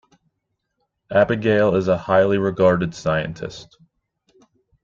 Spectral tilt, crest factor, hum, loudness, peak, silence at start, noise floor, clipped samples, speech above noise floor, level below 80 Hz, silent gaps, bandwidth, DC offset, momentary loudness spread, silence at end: -7 dB/octave; 18 dB; none; -19 LUFS; -4 dBFS; 1.1 s; -76 dBFS; under 0.1%; 57 dB; -52 dBFS; none; 7.6 kHz; under 0.1%; 13 LU; 1.2 s